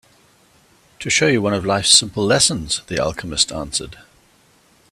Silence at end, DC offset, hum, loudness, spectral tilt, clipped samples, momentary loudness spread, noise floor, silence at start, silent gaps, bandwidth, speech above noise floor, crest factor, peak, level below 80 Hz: 1 s; under 0.1%; none; -16 LUFS; -2.5 dB/octave; under 0.1%; 12 LU; -55 dBFS; 1 s; none; 15.5 kHz; 37 dB; 20 dB; 0 dBFS; -46 dBFS